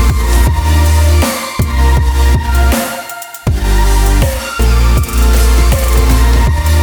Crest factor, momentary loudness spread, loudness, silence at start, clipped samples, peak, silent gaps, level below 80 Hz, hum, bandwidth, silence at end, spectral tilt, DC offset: 10 dB; 5 LU; -12 LUFS; 0 s; under 0.1%; 0 dBFS; none; -10 dBFS; none; over 20 kHz; 0 s; -5 dB/octave; under 0.1%